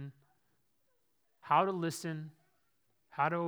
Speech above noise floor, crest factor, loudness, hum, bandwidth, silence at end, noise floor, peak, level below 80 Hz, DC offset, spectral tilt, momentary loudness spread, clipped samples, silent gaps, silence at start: 47 dB; 22 dB; -34 LUFS; none; over 20 kHz; 0 s; -79 dBFS; -16 dBFS; under -90 dBFS; under 0.1%; -5.5 dB/octave; 19 LU; under 0.1%; none; 0 s